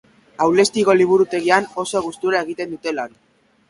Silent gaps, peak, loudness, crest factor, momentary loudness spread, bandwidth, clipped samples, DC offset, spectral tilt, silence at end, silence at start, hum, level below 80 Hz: none; 0 dBFS; -18 LUFS; 18 dB; 11 LU; 11.5 kHz; under 0.1%; under 0.1%; -4 dB/octave; 0.6 s; 0.4 s; none; -60 dBFS